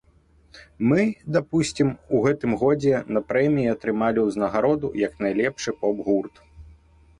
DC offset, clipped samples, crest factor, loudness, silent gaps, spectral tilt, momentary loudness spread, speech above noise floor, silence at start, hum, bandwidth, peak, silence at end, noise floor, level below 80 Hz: under 0.1%; under 0.1%; 16 dB; -23 LUFS; none; -6.5 dB/octave; 5 LU; 35 dB; 0.55 s; none; 11 kHz; -8 dBFS; 0.5 s; -57 dBFS; -52 dBFS